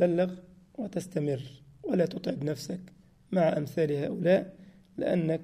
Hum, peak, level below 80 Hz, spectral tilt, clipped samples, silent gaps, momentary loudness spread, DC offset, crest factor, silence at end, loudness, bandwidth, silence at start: none; -12 dBFS; -66 dBFS; -7.5 dB/octave; under 0.1%; none; 16 LU; under 0.1%; 18 dB; 0 s; -30 LUFS; 15 kHz; 0 s